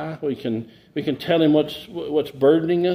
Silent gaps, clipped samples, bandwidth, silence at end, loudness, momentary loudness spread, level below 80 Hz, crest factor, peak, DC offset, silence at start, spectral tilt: none; under 0.1%; 16 kHz; 0 s; -21 LUFS; 12 LU; -60 dBFS; 16 dB; -4 dBFS; under 0.1%; 0 s; -7.5 dB/octave